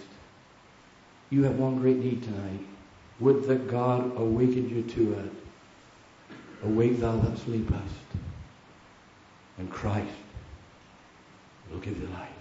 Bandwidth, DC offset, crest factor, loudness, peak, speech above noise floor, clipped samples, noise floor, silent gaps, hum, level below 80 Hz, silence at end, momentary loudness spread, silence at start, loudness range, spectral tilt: 8 kHz; under 0.1%; 20 dB; -28 LUFS; -10 dBFS; 28 dB; under 0.1%; -55 dBFS; none; none; -48 dBFS; 0 s; 22 LU; 0 s; 11 LU; -8.5 dB/octave